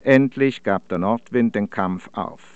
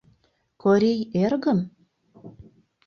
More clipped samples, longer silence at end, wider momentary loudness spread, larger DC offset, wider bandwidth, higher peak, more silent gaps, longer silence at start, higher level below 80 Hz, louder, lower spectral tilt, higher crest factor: neither; second, 0.2 s vs 0.45 s; first, 11 LU vs 7 LU; first, 0.4% vs under 0.1%; first, 8 kHz vs 7 kHz; first, -2 dBFS vs -8 dBFS; neither; second, 0.05 s vs 0.65 s; about the same, -62 dBFS vs -62 dBFS; about the same, -21 LUFS vs -22 LUFS; about the same, -8 dB/octave vs -8 dB/octave; about the same, 18 dB vs 16 dB